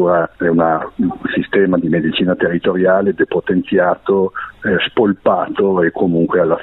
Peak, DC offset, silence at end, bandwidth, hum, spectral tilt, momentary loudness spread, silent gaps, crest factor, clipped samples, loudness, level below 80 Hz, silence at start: -2 dBFS; under 0.1%; 0 s; 4.1 kHz; none; -10 dB/octave; 4 LU; none; 14 dB; under 0.1%; -15 LUFS; -50 dBFS; 0 s